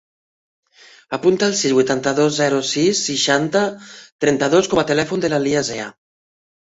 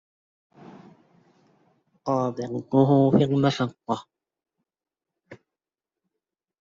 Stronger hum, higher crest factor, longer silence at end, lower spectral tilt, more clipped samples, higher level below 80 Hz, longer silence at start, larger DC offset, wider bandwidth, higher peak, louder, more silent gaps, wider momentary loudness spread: neither; second, 16 dB vs 22 dB; second, 0.75 s vs 1.25 s; second, -3.5 dB/octave vs -7.5 dB/octave; neither; first, -56 dBFS vs -66 dBFS; second, 1.1 s vs 2.05 s; neither; about the same, 8 kHz vs 7.6 kHz; first, -2 dBFS vs -6 dBFS; first, -18 LUFS vs -23 LUFS; first, 4.12-4.19 s vs none; second, 8 LU vs 13 LU